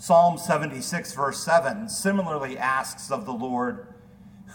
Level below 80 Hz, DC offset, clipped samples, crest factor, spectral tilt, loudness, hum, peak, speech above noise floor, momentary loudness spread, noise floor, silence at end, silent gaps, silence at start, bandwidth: -62 dBFS; under 0.1%; under 0.1%; 18 dB; -4.5 dB/octave; -25 LUFS; none; -6 dBFS; 24 dB; 9 LU; -48 dBFS; 0 s; none; 0 s; 19 kHz